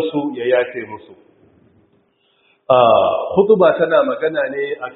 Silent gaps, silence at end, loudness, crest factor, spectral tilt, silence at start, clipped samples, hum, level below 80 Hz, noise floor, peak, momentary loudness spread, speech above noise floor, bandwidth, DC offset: none; 0.05 s; -15 LUFS; 18 dB; -4 dB/octave; 0 s; under 0.1%; none; -60 dBFS; -60 dBFS; 0 dBFS; 13 LU; 44 dB; 4.1 kHz; under 0.1%